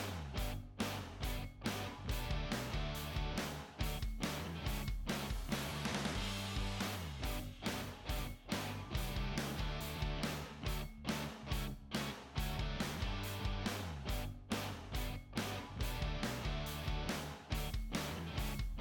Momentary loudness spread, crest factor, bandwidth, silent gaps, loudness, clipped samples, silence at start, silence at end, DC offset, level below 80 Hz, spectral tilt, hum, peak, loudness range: 3 LU; 16 dB; 19 kHz; none; -42 LUFS; under 0.1%; 0 s; 0 s; under 0.1%; -46 dBFS; -4.5 dB/octave; none; -26 dBFS; 1 LU